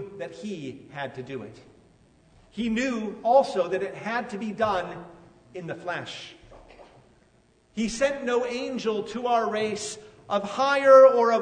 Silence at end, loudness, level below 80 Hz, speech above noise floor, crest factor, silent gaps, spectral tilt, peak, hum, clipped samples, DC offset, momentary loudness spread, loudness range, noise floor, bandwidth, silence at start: 0 s; -24 LUFS; -60 dBFS; 37 dB; 20 dB; none; -4.5 dB/octave; -4 dBFS; none; under 0.1%; under 0.1%; 20 LU; 10 LU; -62 dBFS; 9.6 kHz; 0 s